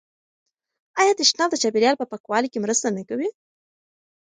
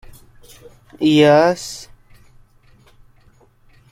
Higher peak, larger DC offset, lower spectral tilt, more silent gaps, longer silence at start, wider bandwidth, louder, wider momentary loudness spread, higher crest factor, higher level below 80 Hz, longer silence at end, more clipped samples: about the same, -2 dBFS vs -2 dBFS; neither; second, -2 dB/octave vs -5.5 dB/octave; first, 2.20-2.24 s vs none; about the same, 0.95 s vs 1 s; second, 9.6 kHz vs 15.5 kHz; second, -21 LUFS vs -14 LUFS; second, 11 LU vs 19 LU; about the same, 22 dB vs 18 dB; second, -74 dBFS vs -52 dBFS; second, 1 s vs 2.1 s; neither